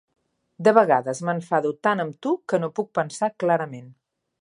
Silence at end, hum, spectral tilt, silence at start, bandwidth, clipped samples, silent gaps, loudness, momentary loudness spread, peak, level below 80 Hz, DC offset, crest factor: 0.5 s; none; -6 dB/octave; 0.6 s; 11 kHz; under 0.1%; none; -23 LUFS; 9 LU; -2 dBFS; -74 dBFS; under 0.1%; 22 dB